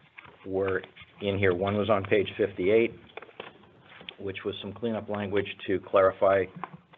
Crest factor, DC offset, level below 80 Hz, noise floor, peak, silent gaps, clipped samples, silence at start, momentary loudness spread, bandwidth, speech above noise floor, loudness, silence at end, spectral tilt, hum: 20 dB; under 0.1%; -66 dBFS; -53 dBFS; -10 dBFS; none; under 0.1%; 0.45 s; 21 LU; 4.3 kHz; 26 dB; -28 LUFS; 0.2 s; -4.5 dB/octave; none